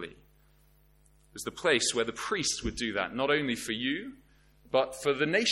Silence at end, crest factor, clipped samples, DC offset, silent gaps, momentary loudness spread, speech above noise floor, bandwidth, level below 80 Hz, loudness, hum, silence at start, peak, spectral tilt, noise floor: 0 s; 20 dB; under 0.1%; under 0.1%; none; 14 LU; 33 dB; 16.5 kHz; -54 dBFS; -30 LUFS; 50 Hz at -55 dBFS; 0 s; -12 dBFS; -2.5 dB/octave; -63 dBFS